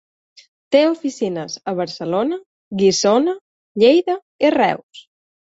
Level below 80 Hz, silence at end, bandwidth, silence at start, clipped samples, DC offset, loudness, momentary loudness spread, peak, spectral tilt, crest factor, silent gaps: -64 dBFS; 0.45 s; 8 kHz; 0.7 s; under 0.1%; under 0.1%; -18 LUFS; 14 LU; -2 dBFS; -4.5 dB/octave; 16 dB; 2.46-2.71 s, 3.41-3.75 s, 4.22-4.39 s, 4.83-4.89 s